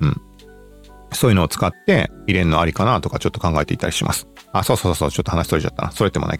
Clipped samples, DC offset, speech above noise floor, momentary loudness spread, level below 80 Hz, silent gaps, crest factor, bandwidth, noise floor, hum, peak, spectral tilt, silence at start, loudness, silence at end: under 0.1%; under 0.1%; 25 dB; 6 LU; -36 dBFS; none; 18 dB; 17.5 kHz; -43 dBFS; 50 Hz at -40 dBFS; -2 dBFS; -5.5 dB/octave; 0 s; -19 LUFS; 0 s